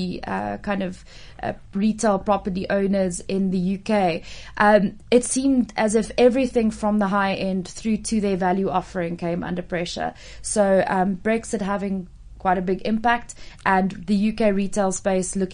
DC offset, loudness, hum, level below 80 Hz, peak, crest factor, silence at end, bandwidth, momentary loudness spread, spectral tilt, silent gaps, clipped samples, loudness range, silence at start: under 0.1%; -22 LUFS; none; -46 dBFS; -4 dBFS; 18 dB; 0 s; 10.5 kHz; 10 LU; -5.5 dB/octave; none; under 0.1%; 4 LU; 0 s